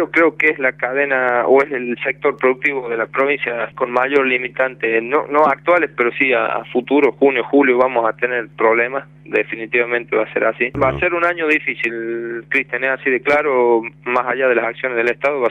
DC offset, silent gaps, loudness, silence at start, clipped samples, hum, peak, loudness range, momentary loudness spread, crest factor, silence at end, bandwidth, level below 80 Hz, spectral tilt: under 0.1%; none; -17 LUFS; 0 s; under 0.1%; none; -2 dBFS; 2 LU; 6 LU; 16 dB; 0 s; 7.8 kHz; -52 dBFS; -6.5 dB/octave